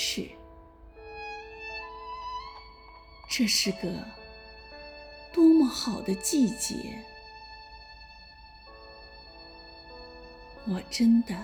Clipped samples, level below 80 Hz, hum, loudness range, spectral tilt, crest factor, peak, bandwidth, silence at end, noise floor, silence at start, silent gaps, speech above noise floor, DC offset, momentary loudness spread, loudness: under 0.1%; -54 dBFS; none; 18 LU; -3.5 dB/octave; 18 dB; -12 dBFS; over 20 kHz; 0 s; -51 dBFS; 0 s; none; 25 dB; under 0.1%; 25 LU; -28 LUFS